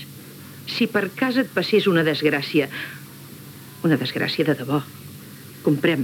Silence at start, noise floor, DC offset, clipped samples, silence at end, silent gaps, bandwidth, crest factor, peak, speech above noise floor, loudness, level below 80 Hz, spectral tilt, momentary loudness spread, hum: 0 s; -40 dBFS; under 0.1%; under 0.1%; 0 s; none; 18.5 kHz; 18 dB; -6 dBFS; 19 dB; -22 LUFS; -72 dBFS; -6 dB/octave; 21 LU; none